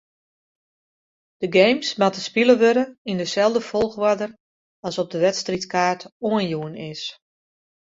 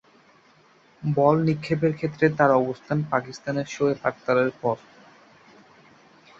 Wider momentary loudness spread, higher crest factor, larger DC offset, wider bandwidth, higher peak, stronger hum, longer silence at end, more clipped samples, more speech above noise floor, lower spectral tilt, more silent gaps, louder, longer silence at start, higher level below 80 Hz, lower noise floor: first, 14 LU vs 9 LU; about the same, 20 dB vs 20 dB; neither; about the same, 7.8 kHz vs 7.6 kHz; about the same, -2 dBFS vs -4 dBFS; neither; second, 0.8 s vs 1.65 s; neither; first, over 69 dB vs 34 dB; second, -4.5 dB/octave vs -7.5 dB/octave; first, 2.98-3.05 s, 4.40-4.83 s, 6.12-6.20 s vs none; first, -21 LUFS vs -24 LUFS; first, 1.4 s vs 1 s; about the same, -62 dBFS vs -62 dBFS; first, under -90 dBFS vs -57 dBFS